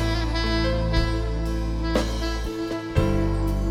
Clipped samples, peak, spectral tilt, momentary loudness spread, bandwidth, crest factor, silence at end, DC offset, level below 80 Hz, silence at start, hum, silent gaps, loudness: under 0.1%; -6 dBFS; -6 dB/octave; 5 LU; 13 kHz; 18 dB; 0 s; under 0.1%; -26 dBFS; 0 s; none; none; -25 LUFS